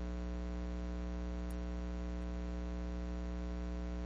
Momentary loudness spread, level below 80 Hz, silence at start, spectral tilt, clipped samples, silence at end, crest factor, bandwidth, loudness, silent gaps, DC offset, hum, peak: 0 LU; -42 dBFS; 0 s; -7.5 dB/octave; under 0.1%; 0 s; 8 dB; 7.6 kHz; -43 LUFS; none; under 0.1%; 60 Hz at -40 dBFS; -32 dBFS